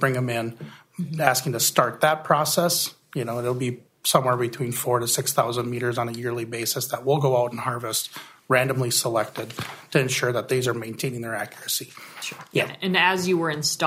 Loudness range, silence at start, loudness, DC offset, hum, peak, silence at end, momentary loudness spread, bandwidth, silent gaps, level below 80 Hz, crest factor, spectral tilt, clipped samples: 3 LU; 0 s; -24 LUFS; under 0.1%; none; 0 dBFS; 0 s; 12 LU; 16 kHz; none; -66 dBFS; 24 dB; -3.5 dB/octave; under 0.1%